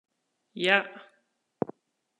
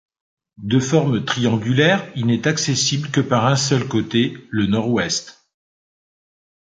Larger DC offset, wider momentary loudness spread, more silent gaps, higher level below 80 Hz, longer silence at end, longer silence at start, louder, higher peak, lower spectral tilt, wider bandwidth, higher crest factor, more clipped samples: neither; first, 18 LU vs 5 LU; neither; second, -82 dBFS vs -52 dBFS; second, 1.2 s vs 1.5 s; about the same, 0.55 s vs 0.6 s; second, -27 LUFS vs -19 LUFS; second, -6 dBFS vs -2 dBFS; about the same, -4.5 dB/octave vs -4.5 dB/octave; first, 11.5 kHz vs 9.4 kHz; first, 26 dB vs 18 dB; neither